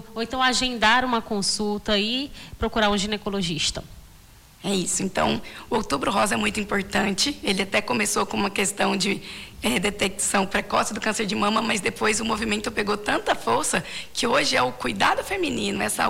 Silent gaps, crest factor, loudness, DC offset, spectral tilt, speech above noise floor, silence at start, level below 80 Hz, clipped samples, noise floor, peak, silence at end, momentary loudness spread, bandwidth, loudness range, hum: none; 16 dB; -23 LUFS; under 0.1%; -3 dB/octave; 25 dB; 0 s; -46 dBFS; under 0.1%; -49 dBFS; -8 dBFS; 0 s; 6 LU; 16.5 kHz; 3 LU; none